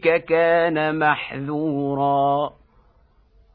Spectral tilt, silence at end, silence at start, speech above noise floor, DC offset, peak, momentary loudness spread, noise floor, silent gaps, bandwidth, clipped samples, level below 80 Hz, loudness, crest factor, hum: -9.5 dB/octave; 1.05 s; 0 s; 37 dB; under 0.1%; -6 dBFS; 7 LU; -57 dBFS; none; 5 kHz; under 0.1%; -56 dBFS; -21 LUFS; 16 dB; none